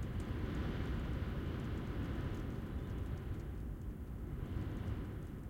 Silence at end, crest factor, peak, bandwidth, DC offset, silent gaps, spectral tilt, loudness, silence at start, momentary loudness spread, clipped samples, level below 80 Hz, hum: 0 s; 14 dB; -26 dBFS; 16.5 kHz; under 0.1%; none; -8 dB/octave; -43 LUFS; 0 s; 5 LU; under 0.1%; -46 dBFS; none